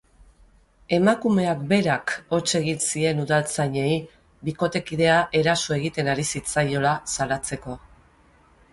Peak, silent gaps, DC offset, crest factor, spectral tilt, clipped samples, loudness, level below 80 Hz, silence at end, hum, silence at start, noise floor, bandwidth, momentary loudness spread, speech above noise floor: -6 dBFS; none; under 0.1%; 18 dB; -4.5 dB/octave; under 0.1%; -23 LUFS; -52 dBFS; 0.95 s; none; 0.9 s; -56 dBFS; 11.5 kHz; 8 LU; 34 dB